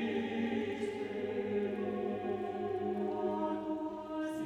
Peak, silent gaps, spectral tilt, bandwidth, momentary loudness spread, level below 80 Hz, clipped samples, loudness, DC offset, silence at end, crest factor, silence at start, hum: -24 dBFS; none; -7 dB/octave; 12 kHz; 4 LU; -70 dBFS; under 0.1%; -37 LUFS; under 0.1%; 0 s; 12 dB; 0 s; none